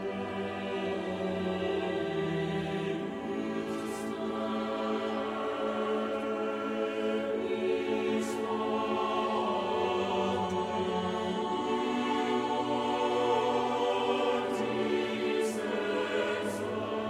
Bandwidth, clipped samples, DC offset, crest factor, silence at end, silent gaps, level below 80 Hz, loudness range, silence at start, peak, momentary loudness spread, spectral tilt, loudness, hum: 14.5 kHz; under 0.1%; under 0.1%; 14 dB; 0 s; none; -66 dBFS; 4 LU; 0 s; -16 dBFS; 5 LU; -5.5 dB/octave; -32 LUFS; none